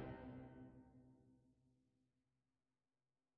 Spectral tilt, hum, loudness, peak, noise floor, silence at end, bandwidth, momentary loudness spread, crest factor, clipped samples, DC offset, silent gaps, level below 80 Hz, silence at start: -7.5 dB/octave; none; -59 LUFS; -40 dBFS; under -90 dBFS; 1.6 s; 4.6 kHz; 14 LU; 20 dB; under 0.1%; under 0.1%; none; -74 dBFS; 0 s